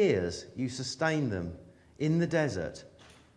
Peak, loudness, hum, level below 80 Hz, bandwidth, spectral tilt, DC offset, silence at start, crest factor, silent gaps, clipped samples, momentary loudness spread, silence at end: -12 dBFS; -32 LUFS; none; -58 dBFS; 10.5 kHz; -6 dB/octave; under 0.1%; 0 s; 18 dB; none; under 0.1%; 13 LU; 0.35 s